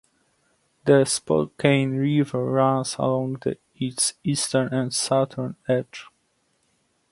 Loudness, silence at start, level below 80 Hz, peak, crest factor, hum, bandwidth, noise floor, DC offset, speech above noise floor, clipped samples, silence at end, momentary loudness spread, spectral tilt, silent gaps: -23 LUFS; 0.85 s; -62 dBFS; -4 dBFS; 20 dB; none; 11.5 kHz; -69 dBFS; under 0.1%; 46 dB; under 0.1%; 1.1 s; 10 LU; -5 dB/octave; none